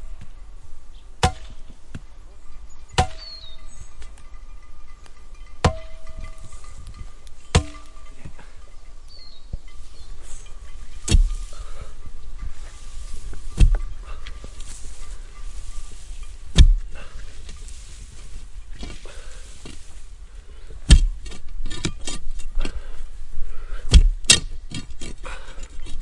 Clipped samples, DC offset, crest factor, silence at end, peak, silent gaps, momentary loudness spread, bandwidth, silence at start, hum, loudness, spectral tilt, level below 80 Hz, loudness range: under 0.1%; under 0.1%; 22 dB; 0 s; 0 dBFS; none; 27 LU; 11.5 kHz; 0 s; none; -22 LUFS; -3.5 dB/octave; -26 dBFS; 10 LU